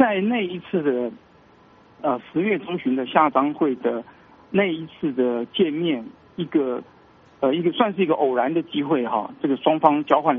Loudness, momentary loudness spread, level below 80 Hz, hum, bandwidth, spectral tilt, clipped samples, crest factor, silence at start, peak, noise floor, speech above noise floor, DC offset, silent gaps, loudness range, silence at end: -22 LUFS; 8 LU; -66 dBFS; none; 3.9 kHz; -4.5 dB/octave; under 0.1%; 22 dB; 0 s; 0 dBFS; -52 dBFS; 31 dB; under 0.1%; none; 3 LU; 0 s